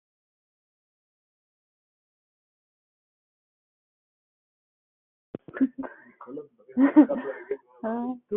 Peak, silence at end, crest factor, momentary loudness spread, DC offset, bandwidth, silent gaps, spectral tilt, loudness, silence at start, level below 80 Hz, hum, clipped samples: -6 dBFS; 0 s; 24 dB; 23 LU; under 0.1%; 3.5 kHz; none; -6.5 dB/octave; -25 LUFS; 5.55 s; -76 dBFS; none; under 0.1%